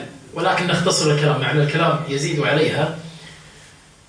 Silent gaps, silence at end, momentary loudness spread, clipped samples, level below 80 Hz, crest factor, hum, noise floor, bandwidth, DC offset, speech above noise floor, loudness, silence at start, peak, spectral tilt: none; 0.6 s; 15 LU; under 0.1%; -54 dBFS; 16 dB; none; -47 dBFS; 10.5 kHz; under 0.1%; 28 dB; -19 LUFS; 0 s; -4 dBFS; -4.5 dB/octave